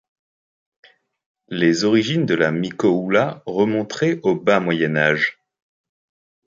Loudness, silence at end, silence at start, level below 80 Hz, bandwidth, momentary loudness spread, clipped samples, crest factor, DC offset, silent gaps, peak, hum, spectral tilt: -19 LUFS; 1.15 s; 1.5 s; -62 dBFS; 7.6 kHz; 4 LU; under 0.1%; 18 dB; under 0.1%; none; -2 dBFS; none; -6 dB/octave